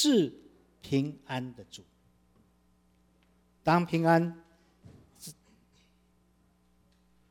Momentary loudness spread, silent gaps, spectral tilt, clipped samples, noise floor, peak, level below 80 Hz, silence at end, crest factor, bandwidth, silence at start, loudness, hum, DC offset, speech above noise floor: 24 LU; none; -5.5 dB/octave; under 0.1%; -67 dBFS; -12 dBFS; -68 dBFS; 2 s; 22 dB; 17 kHz; 0 s; -29 LUFS; 60 Hz at -60 dBFS; under 0.1%; 39 dB